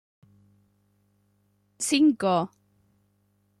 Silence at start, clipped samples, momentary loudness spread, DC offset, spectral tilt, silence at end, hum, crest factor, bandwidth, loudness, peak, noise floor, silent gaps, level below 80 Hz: 1.8 s; under 0.1%; 11 LU; under 0.1%; -4 dB/octave; 1.15 s; 50 Hz at -60 dBFS; 20 dB; 13.5 kHz; -24 LUFS; -10 dBFS; -69 dBFS; none; -74 dBFS